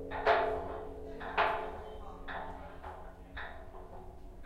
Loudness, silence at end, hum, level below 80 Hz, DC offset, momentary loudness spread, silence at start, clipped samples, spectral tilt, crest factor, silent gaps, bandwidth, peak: -36 LUFS; 0 s; none; -50 dBFS; under 0.1%; 20 LU; 0 s; under 0.1%; -5.5 dB/octave; 22 dB; none; 14.5 kHz; -14 dBFS